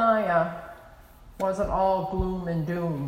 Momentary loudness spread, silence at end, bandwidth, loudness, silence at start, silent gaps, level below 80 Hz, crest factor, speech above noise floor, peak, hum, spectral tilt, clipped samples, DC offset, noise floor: 8 LU; 0 s; 16 kHz; -26 LUFS; 0 s; none; -42 dBFS; 16 dB; 23 dB; -10 dBFS; none; -8 dB/octave; under 0.1%; under 0.1%; -49 dBFS